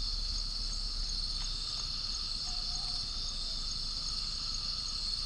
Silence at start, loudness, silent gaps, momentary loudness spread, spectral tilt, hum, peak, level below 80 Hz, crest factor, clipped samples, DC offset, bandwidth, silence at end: 0 s; -34 LUFS; none; 1 LU; -1 dB/octave; none; -22 dBFS; -40 dBFS; 14 dB; under 0.1%; under 0.1%; 10.5 kHz; 0 s